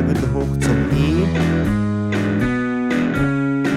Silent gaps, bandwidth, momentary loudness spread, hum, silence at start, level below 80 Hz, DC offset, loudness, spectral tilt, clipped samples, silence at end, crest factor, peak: none; 14 kHz; 3 LU; none; 0 s; -30 dBFS; under 0.1%; -19 LUFS; -7 dB/octave; under 0.1%; 0 s; 12 dB; -6 dBFS